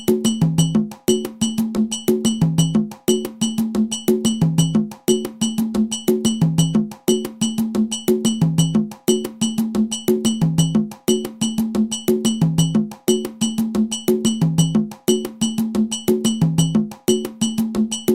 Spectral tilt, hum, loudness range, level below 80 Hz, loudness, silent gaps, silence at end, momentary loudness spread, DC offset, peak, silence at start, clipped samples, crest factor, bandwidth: -5.5 dB/octave; none; 1 LU; -48 dBFS; -19 LUFS; none; 0 s; 3 LU; 0.2%; -2 dBFS; 0 s; under 0.1%; 18 dB; 17 kHz